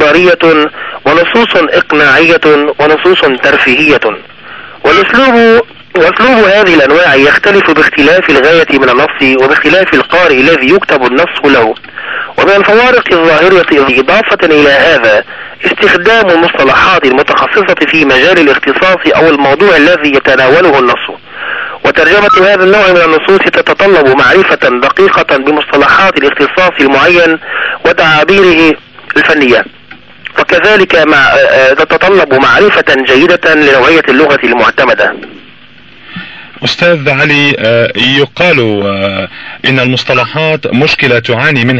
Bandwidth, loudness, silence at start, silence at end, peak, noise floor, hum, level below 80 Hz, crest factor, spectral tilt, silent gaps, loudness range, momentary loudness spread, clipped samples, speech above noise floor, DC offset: 8.8 kHz; -5 LUFS; 0 s; 0 s; 0 dBFS; -36 dBFS; none; -38 dBFS; 6 dB; -5 dB/octave; none; 3 LU; 8 LU; 0.9%; 30 dB; under 0.1%